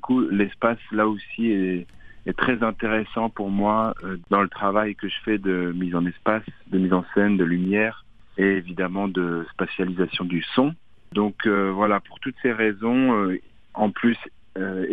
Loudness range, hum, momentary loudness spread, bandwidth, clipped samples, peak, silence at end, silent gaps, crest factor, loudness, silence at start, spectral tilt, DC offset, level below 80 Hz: 2 LU; none; 8 LU; 4.9 kHz; under 0.1%; -2 dBFS; 0 s; none; 20 dB; -23 LUFS; 0.05 s; -9 dB/octave; 0.4%; -52 dBFS